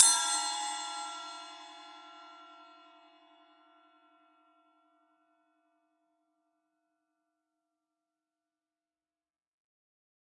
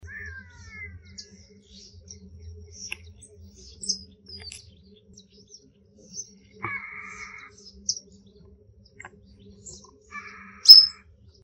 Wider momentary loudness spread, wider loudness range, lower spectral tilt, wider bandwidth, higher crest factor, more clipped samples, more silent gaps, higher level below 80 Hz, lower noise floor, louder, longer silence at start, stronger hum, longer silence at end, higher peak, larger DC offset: second, 25 LU vs 32 LU; about the same, 24 LU vs 23 LU; second, 4.5 dB/octave vs 0.5 dB/octave; second, 11.5 kHz vs 16 kHz; first, 34 dB vs 26 dB; neither; neither; second, under -90 dBFS vs -56 dBFS; first, under -90 dBFS vs -56 dBFS; second, -31 LUFS vs -15 LUFS; second, 0 s vs 3.9 s; neither; first, 7.75 s vs 0.55 s; second, -4 dBFS vs 0 dBFS; neither